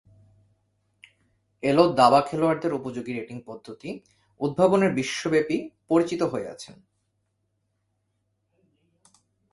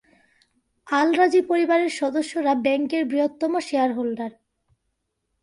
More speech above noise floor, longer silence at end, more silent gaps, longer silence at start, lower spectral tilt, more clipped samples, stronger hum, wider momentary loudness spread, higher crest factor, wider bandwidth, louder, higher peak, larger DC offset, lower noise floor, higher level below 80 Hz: second, 51 dB vs 55 dB; first, 2.8 s vs 1.15 s; neither; first, 1.65 s vs 0.85 s; first, -6 dB/octave vs -4 dB/octave; neither; neither; first, 20 LU vs 8 LU; first, 24 dB vs 18 dB; about the same, 11.5 kHz vs 11.5 kHz; about the same, -23 LUFS vs -22 LUFS; first, -2 dBFS vs -6 dBFS; neither; about the same, -75 dBFS vs -76 dBFS; first, -64 dBFS vs -70 dBFS